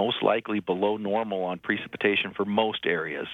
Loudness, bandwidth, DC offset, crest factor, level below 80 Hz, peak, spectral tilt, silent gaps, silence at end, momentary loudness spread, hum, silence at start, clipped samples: -27 LUFS; 4.5 kHz; under 0.1%; 18 dB; -70 dBFS; -8 dBFS; -7 dB/octave; none; 0 s; 5 LU; none; 0 s; under 0.1%